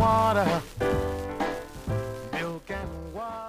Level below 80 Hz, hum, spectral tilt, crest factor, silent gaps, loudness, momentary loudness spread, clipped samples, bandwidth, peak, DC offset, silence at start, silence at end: -42 dBFS; none; -6 dB/octave; 18 dB; none; -29 LUFS; 13 LU; under 0.1%; 15.5 kHz; -10 dBFS; under 0.1%; 0 s; 0 s